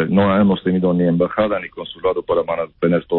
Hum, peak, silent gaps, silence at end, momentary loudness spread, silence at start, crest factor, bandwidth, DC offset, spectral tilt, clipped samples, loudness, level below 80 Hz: none; -4 dBFS; none; 0 s; 8 LU; 0 s; 14 dB; 4.2 kHz; under 0.1%; -12.5 dB/octave; under 0.1%; -18 LUFS; -48 dBFS